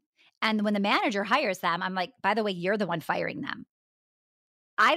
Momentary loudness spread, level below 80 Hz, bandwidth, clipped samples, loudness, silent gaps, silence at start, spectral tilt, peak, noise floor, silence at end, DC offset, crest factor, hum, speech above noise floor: 9 LU; -76 dBFS; 15.5 kHz; under 0.1%; -28 LUFS; 3.70-4.77 s; 0.4 s; -5 dB/octave; -12 dBFS; under -90 dBFS; 0 s; under 0.1%; 18 dB; none; over 62 dB